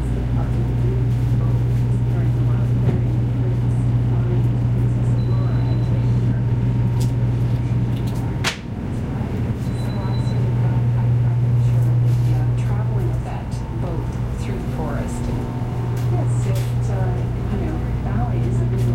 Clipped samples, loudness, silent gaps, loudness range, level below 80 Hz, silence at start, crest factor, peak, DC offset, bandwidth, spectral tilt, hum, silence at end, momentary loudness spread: under 0.1%; -20 LUFS; none; 4 LU; -30 dBFS; 0 s; 12 dB; -6 dBFS; under 0.1%; 9.4 kHz; -8 dB/octave; none; 0 s; 6 LU